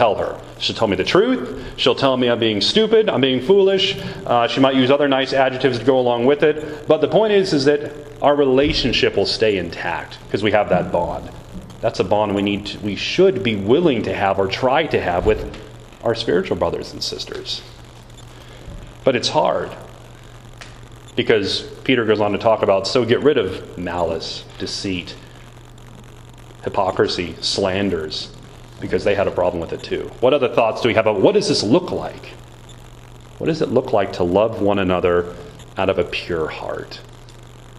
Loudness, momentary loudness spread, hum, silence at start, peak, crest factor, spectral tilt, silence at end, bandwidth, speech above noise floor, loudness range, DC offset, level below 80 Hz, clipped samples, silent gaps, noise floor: -18 LUFS; 13 LU; none; 0 s; 0 dBFS; 18 dB; -5 dB/octave; 0 s; 12 kHz; 22 dB; 7 LU; under 0.1%; -42 dBFS; under 0.1%; none; -40 dBFS